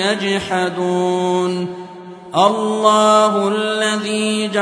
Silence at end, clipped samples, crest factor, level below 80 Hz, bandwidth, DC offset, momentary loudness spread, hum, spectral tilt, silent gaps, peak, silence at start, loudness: 0 s; under 0.1%; 16 dB; -60 dBFS; 11 kHz; under 0.1%; 11 LU; none; -4 dB/octave; none; 0 dBFS; 0 s; -16 LUFS